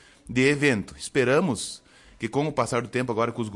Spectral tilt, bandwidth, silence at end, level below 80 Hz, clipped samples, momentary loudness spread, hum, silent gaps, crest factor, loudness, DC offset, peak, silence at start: -5 dB/octave; 11.5 kHz; 0 s; -56 dBFS; under 0.1%; 10 LU; none; none; 16 dB; -25 LUFS; under 0.1%; -10 dBFS; 0.25 s